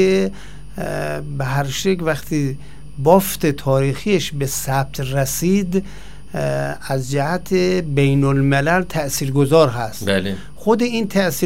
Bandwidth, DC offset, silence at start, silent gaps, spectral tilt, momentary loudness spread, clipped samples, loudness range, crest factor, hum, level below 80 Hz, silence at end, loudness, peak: 16 kHz; 3%; 0 s; none; -5.5 dB/octave; 10 LU; under 0.1%; 4 LU; 18 dB; none; -40 dBFS; 0 s; -19 LUFS; 0 dBFS